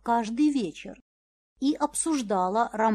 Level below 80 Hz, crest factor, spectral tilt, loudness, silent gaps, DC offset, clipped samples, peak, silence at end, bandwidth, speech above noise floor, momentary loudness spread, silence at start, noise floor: -62 dBFS; 16 dB; -4 dB/octave; -27 LUFS; 1.01-1.56 s; under 0.1%; under 0.1%; -12 dBFS; 0 s; 13 kHz; over 64 dB; 10 LU; 0.05 s; under -90 dBFS